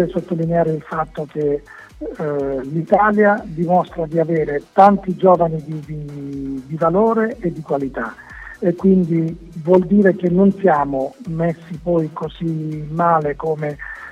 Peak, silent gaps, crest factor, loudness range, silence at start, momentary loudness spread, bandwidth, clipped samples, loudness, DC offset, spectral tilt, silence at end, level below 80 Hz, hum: 0 dBFS; none; 18 dB; 4 LU; 0 s; 13 LU; 7.6 kHz; under 0.1%; -18 LUFS; under 0.1%; -9.5 dB/octave; 0 s; -44 dBFS; none